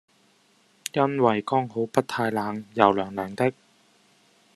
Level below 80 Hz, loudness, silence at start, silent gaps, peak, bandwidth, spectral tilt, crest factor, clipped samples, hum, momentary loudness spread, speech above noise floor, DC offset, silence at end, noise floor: -68 dBFS; -25 LUFS; 0.95 s; none; -2 dBFS; 13 kHz; -6 dB/octave; 26 dB; under 0.1%; none; 10 LU; 38 dB; under 0.1%; 1.05 s; -62 dBFS